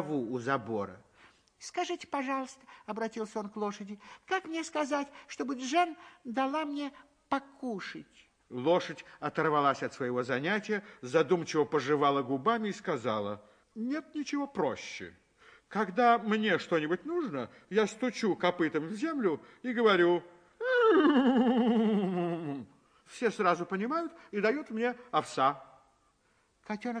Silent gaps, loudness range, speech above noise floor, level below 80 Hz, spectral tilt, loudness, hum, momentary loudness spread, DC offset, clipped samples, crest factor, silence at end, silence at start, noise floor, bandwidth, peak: none; 9 LU; 40 dB; -76 dBFS; -5.5 dB/octave; -31 LUFS; none; 14 LU; under 0.1%; under 0.1%; 20 dB; 0 s; 0 s; -71 dBFS; 10.5 kHz; -12 dBFS